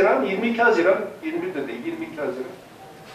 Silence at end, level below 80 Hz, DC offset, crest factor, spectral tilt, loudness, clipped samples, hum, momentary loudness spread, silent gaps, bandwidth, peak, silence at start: 0 s; -68 dBFS; under 0.1%; 16 dB; -5.5 dB/octave; -23 LUFS; under 0.1%; none; 20 LU; none; 14.5 kHz; -6 dBFS; 0 s